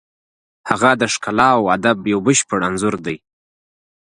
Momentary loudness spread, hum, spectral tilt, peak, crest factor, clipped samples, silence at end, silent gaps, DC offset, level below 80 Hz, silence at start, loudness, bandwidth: 12 LU; none; -4 dB/octave; 0 dBFS; 18 dB; under 0.1%; 0.9 s; none; under 0.1%; -52 dBFS; 0.65 s; -16 LUFS; 11.5 kHz